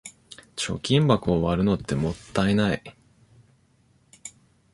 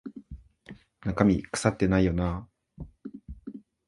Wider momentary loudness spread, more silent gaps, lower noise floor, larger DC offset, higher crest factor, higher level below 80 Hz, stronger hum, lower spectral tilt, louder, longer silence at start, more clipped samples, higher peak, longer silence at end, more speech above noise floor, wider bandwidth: about the same, 22 LU vs 23 LU; neither; first, -62 dBFS vs -51 dBFS; neither; about the same, 22 dB vs 24 dB; about the same, -46 dBFS vs -44 dBFS; neither; about the same, -6 dB/octave vs -6.5 dB/octave; about the same, -24 LUFS vs -26 LUFS; about the same, 0.05 s vs 0.05 s; neither; about the same, -4 dBFS vs -6 dBFS; first, 0.45 s vs 0.3 s; first, 39 dB vs 26 dB; about the same, 11.5 kHz vs 11.5 kHz